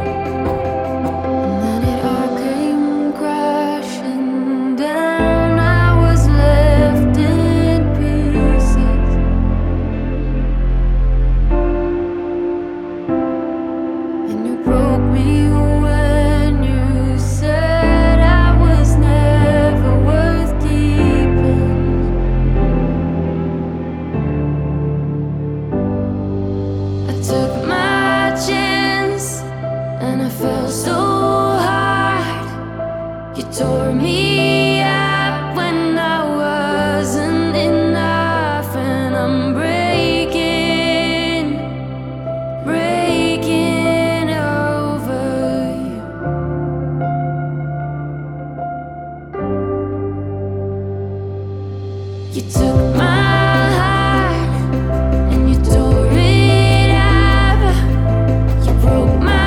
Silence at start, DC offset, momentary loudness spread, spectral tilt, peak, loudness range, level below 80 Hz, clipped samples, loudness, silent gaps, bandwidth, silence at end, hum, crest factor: 0 s; under 0.1%; 11 LU; -6.5 dB/octave; -2 dBFS; 7 LU; -20 dBFS; under 0.1%; -16 LUFS; none; 14.5 kHz; 0 s; none; 14 dB